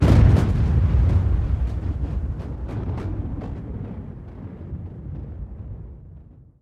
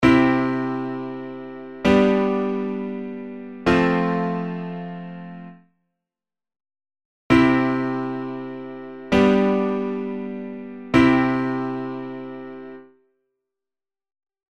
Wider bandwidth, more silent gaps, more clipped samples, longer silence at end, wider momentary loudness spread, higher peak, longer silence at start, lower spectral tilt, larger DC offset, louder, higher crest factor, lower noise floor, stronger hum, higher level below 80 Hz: second, 7.6 kHz vs 8.8 kHz; second, none vs 7.05-7.30 s; neither; second, 0.2 s vs 1.75 s; about the same, 18 LU vs 19 LU; about the same, -2 dBFS vs -2 dBFS; about the same, 0 s vs 0 s; first, -9 dB/octave vs -7.5 dB/octave; second, under 0.1% vs 0.2%; about the same, -23 LUFS vs -21 LUFS; about the same, 20 dB vs 22 dB; second, -45 dBFS vs under -90 dBFS; neither; first, -26 dBFS vs -48 dBFS